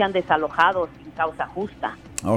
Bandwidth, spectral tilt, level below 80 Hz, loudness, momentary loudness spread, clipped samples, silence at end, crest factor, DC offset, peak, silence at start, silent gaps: 20 kHz; -4.5 dB/octave; -52 dBFS; -24 LUFS; 11 LU; under 0.1%; 0 s; 20 dB; under 0.1%; -4 dBFS; 0 s; none